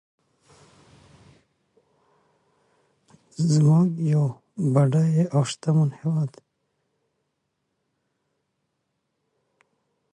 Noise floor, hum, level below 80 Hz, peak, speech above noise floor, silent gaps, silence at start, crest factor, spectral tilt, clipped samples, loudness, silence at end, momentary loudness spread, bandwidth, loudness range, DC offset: -77 dBFS; none; -68 dBFS; -6 dBFS; 56 dB; none; 3.4 s; 20 dB; -7.5 dB/octave; under 0.1%; -22 LUFS; 3.85 s; 10 LU; 10 kHz; 10 LU; under 0.1%